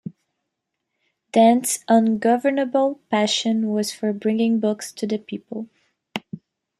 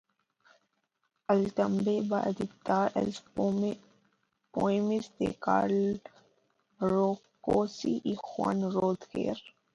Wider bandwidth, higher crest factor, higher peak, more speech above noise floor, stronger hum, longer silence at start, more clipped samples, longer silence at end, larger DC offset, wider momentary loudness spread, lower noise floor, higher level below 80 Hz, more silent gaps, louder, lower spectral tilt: first, 14.5 kHz vs 7.8 kHz; about the same, 18 dB vs 18 dB; first, -4 dBFS vs -12 dBFS; first, 60 dB vs 49 dB; neither; second, 0.05 s vs 1.3 s; neither; first, 0.45 s vs 0.25 s; neither; first, 17 LU vs 7 LU; about the same, -80 dBFS vs -79 dBFS; second, -72 dBFS vs -64 dBFS; neither; first, -20 LUFS vs -31 LUFS; second, -4 dB/octave vs -7 dB/octave